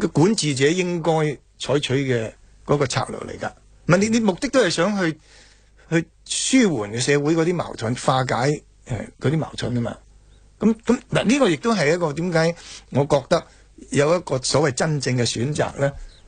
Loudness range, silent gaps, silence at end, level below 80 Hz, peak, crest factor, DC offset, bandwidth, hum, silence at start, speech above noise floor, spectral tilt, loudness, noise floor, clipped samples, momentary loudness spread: 3 LU; none; 0.15 s; -48 dBFS; -2 dBFS; 18 dB; under 0.1%; 9.6 kHz; none; 0 s; 30 dB; -5 dB/octave; -21 LUFS; -50 dBFS; under 0.1%; 12 LU